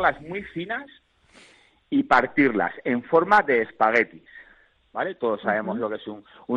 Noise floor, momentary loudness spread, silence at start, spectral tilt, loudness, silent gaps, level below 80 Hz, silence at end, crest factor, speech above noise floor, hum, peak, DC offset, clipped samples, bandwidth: -57 dBFS; 15 LU; 0 s; -6.5 dB/octave; -23 LUFS; none; -60 dBFS; 0 s; 20 dB; 34 dB; none; -4 dBFS; under 0.1%; under 0.1%; 9.4 kHz